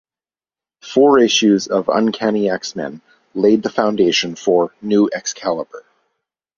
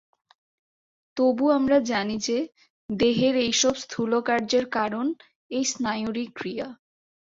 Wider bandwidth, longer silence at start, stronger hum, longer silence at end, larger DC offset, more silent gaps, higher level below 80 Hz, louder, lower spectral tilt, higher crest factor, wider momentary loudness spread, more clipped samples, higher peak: about the same, 7.2 kHz vs 7.8 kHz; second, 0.85 s vs 1.15 s; neither; first, 0.8 s vs 0.5 s; neither; second, none vs 2.70-2.89 s, 5.35-5.49 s; about the same, -60 dBFS vs -62 dBFS; first, -16 LUFS vs -24 LUFS; about the same, -4 dB/octave vs -3.5 dB/octave; about the same, 16 dB vs 16 dB; about the same, 13 LU vs 12 LU; neither; first, 0 dBFS vs -8 dBFS